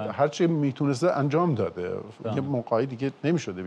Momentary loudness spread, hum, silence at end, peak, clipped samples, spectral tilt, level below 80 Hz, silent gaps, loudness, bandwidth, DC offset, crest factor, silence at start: 7 LU; none; 0 s; -10 dBFS; under 0.1%; -7 dB/octave; -68 dBFS; none; -26 LUFS; 10 kHz; under 0.1%; 16 dB; 0 s